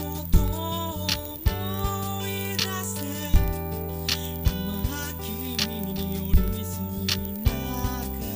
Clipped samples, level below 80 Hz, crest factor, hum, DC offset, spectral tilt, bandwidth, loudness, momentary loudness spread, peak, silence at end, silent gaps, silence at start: under 0.1%; -30 dBFS; 20 dB; none; under 0.1%; -4.5 dB/octave; 16 kHz; -28 LUFS; 5 LU; -6 dBFS; 0 s; none; 0 s